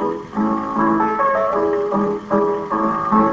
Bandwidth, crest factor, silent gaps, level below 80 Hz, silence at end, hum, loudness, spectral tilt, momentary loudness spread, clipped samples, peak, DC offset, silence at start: 7.6 kHz; 16 dB; none; -48 dBFS; 0 s; none; -19 LUFS; -8.5 dB/octave; 4 LU; under 0.1%; -2 dBFS; under 0.1%; 0 s